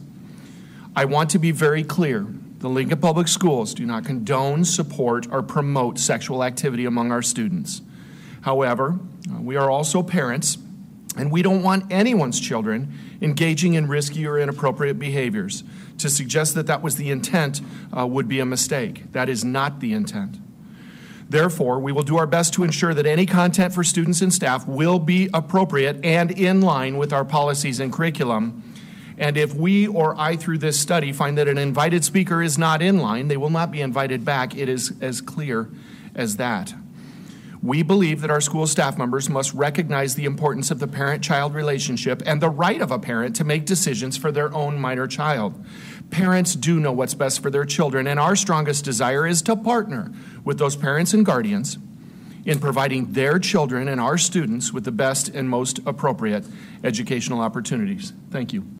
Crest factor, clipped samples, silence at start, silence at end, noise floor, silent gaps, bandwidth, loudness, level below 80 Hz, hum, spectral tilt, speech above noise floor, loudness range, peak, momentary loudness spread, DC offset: 16 dB; under 0.1%; 0 s; 0 s; -42 dBFS; none; 16 kHz; -21 LUFS; -62 dBFS; none; -4.5 dB/octave; 21 dB; 4 LU; -6 dBFS; 11 LU; under 0.1%